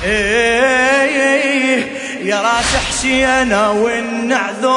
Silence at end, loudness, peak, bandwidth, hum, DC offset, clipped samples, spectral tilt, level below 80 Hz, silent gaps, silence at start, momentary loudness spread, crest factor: 0 s; -13 LUFS; 0 dBFS; 11 kHz; none; under 0.1%; under 0.1%; -3 dB/octave; -36 dBFS; none; 0 s; 6 LU; 14 dB